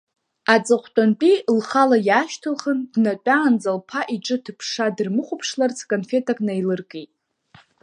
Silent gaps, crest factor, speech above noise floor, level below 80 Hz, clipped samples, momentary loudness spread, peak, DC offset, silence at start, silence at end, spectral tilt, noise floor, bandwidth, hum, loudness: none; 20 dB; 34 dB; -74 dBFS; under 0.1%; 9 LU; 0 dBFS; under 0.1%; 0.5 s; 0.8 s; -5 dB/octave; -54 dBFS; 10.5 kHz; none; -20 LUFS